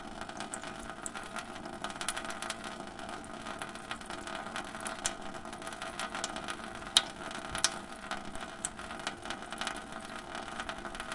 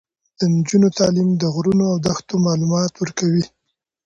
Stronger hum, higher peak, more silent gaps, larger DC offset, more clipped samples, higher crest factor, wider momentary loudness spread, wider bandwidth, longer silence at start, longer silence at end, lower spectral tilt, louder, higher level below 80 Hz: neither; about the same, -4 dBFS vs -4 dBFS; neither; neither; neither; first, 36 dB vs 14 dB; first, 11 LU vs 6 LU; first, 11.5 kHz vs 7.8 kHz; second, 0 s vs 0.4 s; second, 0 s vs 0.6 s; second, -1.5 dB/octave vs -6 dB/octave; second, -38 LUFS vs -18 LUFS; second, -58 dBFS vs -52 dBFS